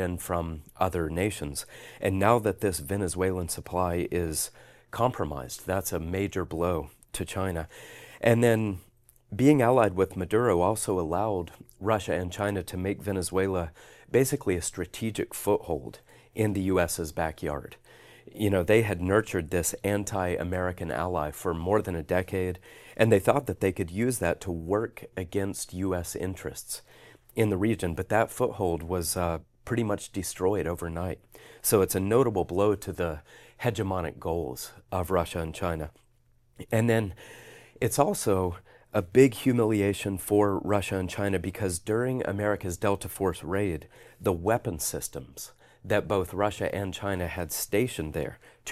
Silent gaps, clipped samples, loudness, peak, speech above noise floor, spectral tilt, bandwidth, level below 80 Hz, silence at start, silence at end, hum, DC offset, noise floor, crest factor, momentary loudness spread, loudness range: none; under 0.1%; -28 LUFS; -6 dBFS; 36 dB; -5.5 dB/octave; 15 kHz; -50 dBFS; 0 s; 0 s; none; under 0.1%; -64 dBFS; 22 dB; 13 LU; 5 LU